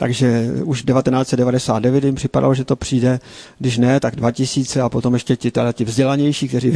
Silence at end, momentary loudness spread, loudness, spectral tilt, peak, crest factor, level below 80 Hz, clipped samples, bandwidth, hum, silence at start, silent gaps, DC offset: 0 s; 4 LU; -17 LUFS; -6.5 dB/octave; -2 dBFS; 14 dB; -44 dBFS; under 0.1%; 11 kHz; none; 0 s; none; under 0.1%